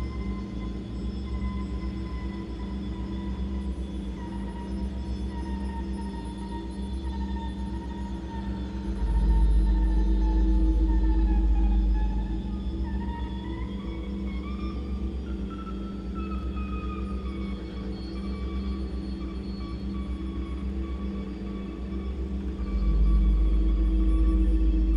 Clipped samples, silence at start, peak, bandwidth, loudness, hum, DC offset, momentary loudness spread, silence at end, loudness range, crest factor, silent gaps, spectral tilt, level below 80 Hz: under 0.1%; 0 s; -14 dBFS; 5.6 kHz; -30 LUFS; none; under 0.1%; 10 LU; 0 s; 8 LU; 14 dB; none; -8.5 dB/octave; -28 dBFS